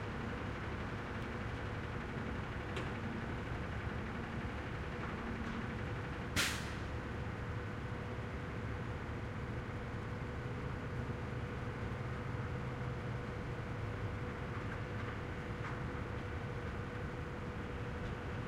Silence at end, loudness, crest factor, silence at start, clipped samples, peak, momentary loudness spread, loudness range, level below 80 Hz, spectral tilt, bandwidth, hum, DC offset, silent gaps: 0 s; -42 LUFS; 20 dB; 0 s; under 0.1%; -20 dBFS; 2 LU; 2 LU; -50 dBFS; -5.5 dB/octave; 16 kHz; none; under 0.1%; none